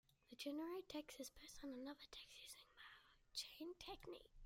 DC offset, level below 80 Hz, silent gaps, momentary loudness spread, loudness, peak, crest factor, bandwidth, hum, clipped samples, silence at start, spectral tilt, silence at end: under 0.1%; -74 dBFS; none; 13 LU; -55 LUFS; -36 dBFS; 18 dB; 16 kHz; none; under 0.1%; 0.3 s; -2.5 dB/octave; 0 s